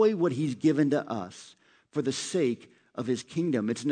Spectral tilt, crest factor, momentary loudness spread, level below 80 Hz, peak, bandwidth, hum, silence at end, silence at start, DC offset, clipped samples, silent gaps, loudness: -6 dB/octave; 16 dB; 13 LU; -76 dBFS; -12 dBFS; 9.4 kHz; none; 0 s; 0 s; under 0.1%; under 0.1%; none; -29 LUFS